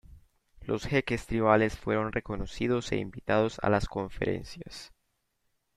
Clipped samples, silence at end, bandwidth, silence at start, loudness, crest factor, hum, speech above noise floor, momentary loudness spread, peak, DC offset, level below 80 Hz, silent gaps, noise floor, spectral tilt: under 0.1%; 0.9 s; 13.5 kHz; 0.1 s; -29 LUFS; 22 dB; none; 48 dB; 16 LU; -8 dBFS; under 0.1%; -46 dBFS; none; -77 dBFS; -6 dB/octave